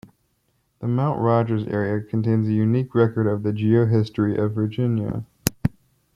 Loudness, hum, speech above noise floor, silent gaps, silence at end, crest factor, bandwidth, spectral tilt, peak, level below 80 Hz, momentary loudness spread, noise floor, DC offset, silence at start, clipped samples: -22 LUFS; none; 47 dB; none; 0.45 s; 22 dB; 16 kHz; -7.5 dB/octave; 0 dBFS; -52 dBFS; 7 LU; -68 dBFS; under 0.1%; 0.8 s; under 0.1%